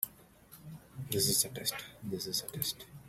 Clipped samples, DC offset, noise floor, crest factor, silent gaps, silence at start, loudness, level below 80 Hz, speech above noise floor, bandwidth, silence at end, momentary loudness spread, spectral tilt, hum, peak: under 0.1%; under 0.1%; -58 dBFS; 24 dB; none; 0 s; -33 LUFS; -66 dBFS; 22 dB; 16 kHz; 0 s; 22 LU; -2.5 dB/octave; none; -12 dBFS